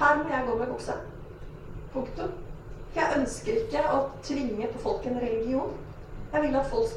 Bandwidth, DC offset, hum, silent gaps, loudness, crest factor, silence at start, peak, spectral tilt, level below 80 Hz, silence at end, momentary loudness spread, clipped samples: 12.5 kHz; under 0.1%; none; none; -29 LUFS; 20 dB; 0 s; -10 dBFS; -5.5 dB/octave; -44 dBFS; 0 s; 17 LU; under 0.1%